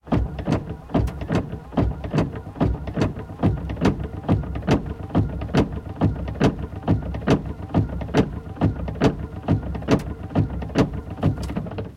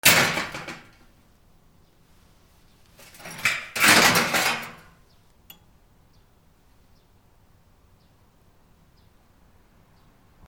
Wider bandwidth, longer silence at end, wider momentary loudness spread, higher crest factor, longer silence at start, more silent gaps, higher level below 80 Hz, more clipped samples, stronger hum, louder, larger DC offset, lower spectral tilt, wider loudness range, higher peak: second, 12 kHz vs over 20 kHz; second, 0 s vs 5.75 s; second, 4 LU vs 25 LU; second, 20 dB vs 28 dB; about the same, 0.05 s vs 0.05 s; neither; first, -32 dBFS vs -58 dBFS; neither; neither; second, -24 LUFS vs -19 LUFS; neither; first, -8 dB/octave vs -1.5 dB/octave; second, 1 LU vs 12 LU; about the same, -2 dBFS vs 0 dBFS